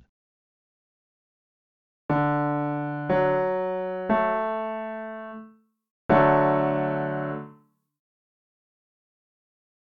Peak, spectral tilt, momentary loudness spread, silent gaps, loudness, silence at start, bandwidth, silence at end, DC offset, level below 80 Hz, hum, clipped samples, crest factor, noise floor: -6 dBFS; -10 dB/octave; 18 LU; 5.91-6.09 s; -25 LUFS; 2.1 s; 4.9 kHz; 2.4 s; under 0.1%; -58 dBFS; none; under 0.1%; 22 dB; -57 dBFS